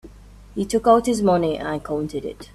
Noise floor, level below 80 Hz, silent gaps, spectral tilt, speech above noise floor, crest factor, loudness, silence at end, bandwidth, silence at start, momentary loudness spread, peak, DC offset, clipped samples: -44 dBFS; -46 dBFS; none; -6 dB/octave; 24 dB; 18 dB; -21 LUFS; 0.1 s; 14 kHz; 0.05 s; 13 LU; -4 dBFS; under 0.1%; under 0.1%